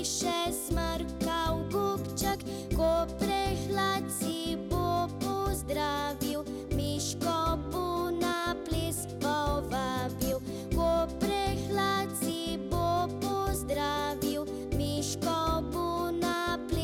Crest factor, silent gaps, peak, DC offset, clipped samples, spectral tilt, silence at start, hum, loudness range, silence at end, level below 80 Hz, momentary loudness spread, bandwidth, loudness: 14 dB; none; -16 dBFS; under 0.1%; under 0.1%; -4.5 dB/octave; 0 s; none; 1 LU; 0 s; -42 dBFS; 4 LU; 18 kHz; -31 LUFS